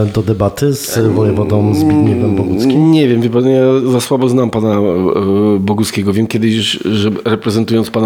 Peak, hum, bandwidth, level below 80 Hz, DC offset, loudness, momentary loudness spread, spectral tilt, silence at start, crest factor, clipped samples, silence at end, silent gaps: 0 dBFS; none; 18 kHz; -44 dBFS; under 0.1%; -12 LUFS; 4 LU; -6.5 dB/octave; 0 s; 12 dB; under 0.1%; 0 s; none